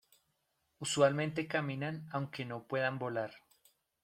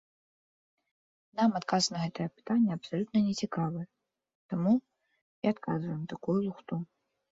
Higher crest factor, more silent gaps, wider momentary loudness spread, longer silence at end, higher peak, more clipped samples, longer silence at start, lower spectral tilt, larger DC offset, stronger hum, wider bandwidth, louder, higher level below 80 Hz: about the same, 22 dB vs 18 dB; second, none vs 4.35-4.49 s, 5.22-5.42 s; about the same, 11 LU vs 10 LU; about the same, 0.65 s vs 0.55 s; about the same, -14 dBFS vs -14 dBFS; neither; second, 0.8 s vs 1.35 s; about the same, -5 dB/octave vs -5.5 dB/octave; neither; neither; first, 15.5 kHz vs 7.8 kHz; second, -36 LUFS vs -32 LUFS; second, -76 dBFS vs -70 dBFS